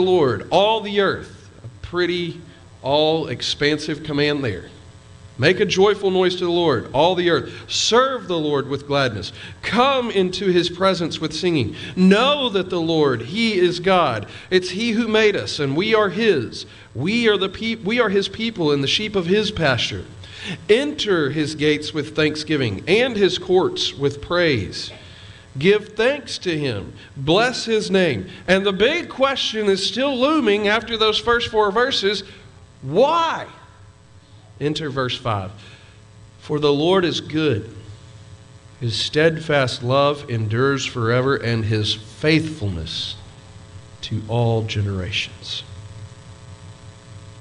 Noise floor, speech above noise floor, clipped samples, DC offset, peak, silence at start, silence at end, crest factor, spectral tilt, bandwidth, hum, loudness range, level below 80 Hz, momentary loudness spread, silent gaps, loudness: -47 dBFS; 27 dB; under 0.1%; under 0.1%; -2 dBFS; 0 s; 0 s; 18 dB; -5 dB/octave; 10.5 kHz; none; 5 LU; -50 dBFS; 12 LU; none; -19 LUFS